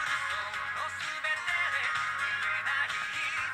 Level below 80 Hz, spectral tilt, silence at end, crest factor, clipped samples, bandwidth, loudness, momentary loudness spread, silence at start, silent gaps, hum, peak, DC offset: -70 dBFS; 0 dB/octave; 0 s; 14 dB; under 0.1%; 16 kHz; -30 LUFS; 5 LU; 0 s; none; none; -18 dBFS; under 0.1%